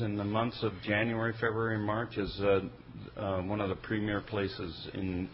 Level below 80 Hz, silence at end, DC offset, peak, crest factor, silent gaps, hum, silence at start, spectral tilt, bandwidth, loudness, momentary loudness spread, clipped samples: -52 dBFS; 0 s; under 0.1%; -16 dBFS; 18 dB; none; none; 0 s; -5 dB/octave; 5.6 kHz; -33 LUFS; 9 LU; under 0.1%